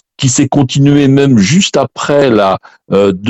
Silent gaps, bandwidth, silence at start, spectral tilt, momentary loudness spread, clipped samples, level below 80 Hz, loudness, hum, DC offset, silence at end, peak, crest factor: none; 8.4 kHz; 0.2 s; -5.5 dB/octave; 6 LU; under 0.1%; -44 dBFS; -10 LUFS; none; under 0.1%; 0 s; 0 dBFS; 10 dB